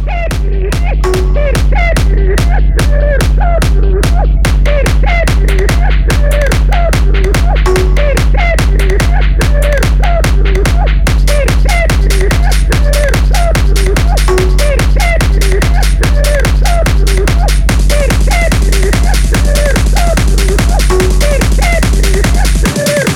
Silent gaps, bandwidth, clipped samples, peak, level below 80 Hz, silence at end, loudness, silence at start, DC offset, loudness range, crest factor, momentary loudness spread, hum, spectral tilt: none; 15.5 kHz; under 0.1%; 0 dBFS; -8 dBFS; 0 s; -11 LUFS; 0 s; under 0.1%; 0 LU; 8 dB; 1 LU; none; -5 dB/octave